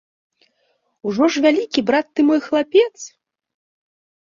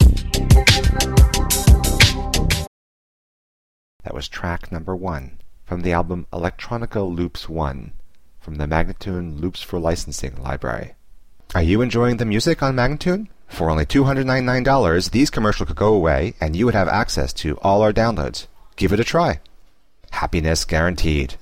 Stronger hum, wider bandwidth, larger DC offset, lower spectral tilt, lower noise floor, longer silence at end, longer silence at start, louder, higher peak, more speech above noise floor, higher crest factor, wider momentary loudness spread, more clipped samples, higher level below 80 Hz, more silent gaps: neither; second, 7.6 kHz vs 15.5 kHz; second, under 0.1% vs 0.6%; about the same, -4.5 dB/octave vs -5 dB/octave; first, -66 dBFS vs -52 dBFS; first, 1.15 s vs 0 s; first, 1.05 s vs 0 s; about the same, -17 LUFS vs -19 LUFS; about the same, -2 dBFS vs 0 dBFS; first, 50 dB vs 32 dB; about the same, 18 dB vs 18 dB; about the same, 13 LU vs 13 LU; neither; second, -64 dBFS vs -24 dBFS; second, none vs 2.67-4.00 s